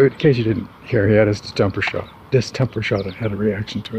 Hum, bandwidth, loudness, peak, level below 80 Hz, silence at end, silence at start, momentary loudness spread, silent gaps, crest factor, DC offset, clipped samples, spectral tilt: none; 9.2 kHz; -20 LUFS; -2 dBFS; -46 dBFS; 0 s; 0 s; 9 LU; none; 16 dB; under 0.1%; under 0.1%; -7 dB/octave